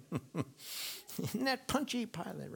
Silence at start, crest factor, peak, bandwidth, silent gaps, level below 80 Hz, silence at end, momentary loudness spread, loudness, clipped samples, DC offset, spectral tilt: 0 s; 20 dB; -18 dBFS; 19.5 kHz; none; -64 dBFS; 0 s; 8 LU; -38 LUFS; under 0.1%; under 0.1%; -4 dB/octave